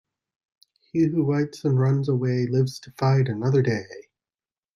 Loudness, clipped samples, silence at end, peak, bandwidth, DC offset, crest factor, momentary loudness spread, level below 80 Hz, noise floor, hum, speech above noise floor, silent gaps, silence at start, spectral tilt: -23 LUFS; under 0.1%; 0.75 s; -10 dBFS; 11 kHz; under 0.1%; 14 dB; 6 LU; -64 dBFS; under -90 dBFS; none; over 68 dB; none; 0.95 s; -8 dB/octave